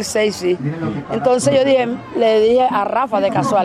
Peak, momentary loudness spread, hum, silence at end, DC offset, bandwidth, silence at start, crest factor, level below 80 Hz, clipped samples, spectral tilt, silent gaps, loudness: -4 dBFS; 8 LU; none; 0 s; under 0.1%; 15 kHz; 0 s; 12 dB; -54 dBFS; under 0.1%; -5 dB/octave; none; -16 LUFS